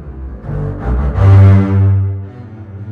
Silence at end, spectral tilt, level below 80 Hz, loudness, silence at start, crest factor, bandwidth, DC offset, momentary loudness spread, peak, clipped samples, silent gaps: 0 s; -10.5 dB/octave; -24 dBFS; -11 LUFS; 0 s; 12 dB; 3.4 kHz; under 0.1%; 23 LU; 0 dBFS; under 0.1%; none